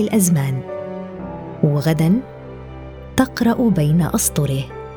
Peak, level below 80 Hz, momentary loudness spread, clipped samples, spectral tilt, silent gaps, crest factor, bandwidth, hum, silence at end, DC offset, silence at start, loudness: 0 dBFS; -40 dBFS; 19 LU; under 0.1%; -6 dB/octave; none; 18 dB; over 20 kHz; none; 0 s; under 0.1%; 0 s; -18 LUFS